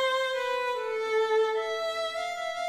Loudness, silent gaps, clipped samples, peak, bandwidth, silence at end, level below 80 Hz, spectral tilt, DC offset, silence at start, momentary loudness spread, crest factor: -29 LUFS; none; under 0.1%; -16 dBFS; 14 kHz; 0 s; -72 dBFS; 0 dB/octave; under 0.1%; 0 s; 6 LU; 12 dB